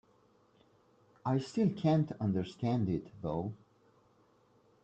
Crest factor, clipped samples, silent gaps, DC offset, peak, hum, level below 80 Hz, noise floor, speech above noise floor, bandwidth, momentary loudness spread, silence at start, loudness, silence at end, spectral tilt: 16 dB; under 0.1%; none; under 0.1%; -20 dBFS; none; -66 dBFS; -68 dBFS; 35 dB; 8.6 kHz; 10 LU; 1.25 s; -34 LUFS; 1.3 s; -8.5 dB/octave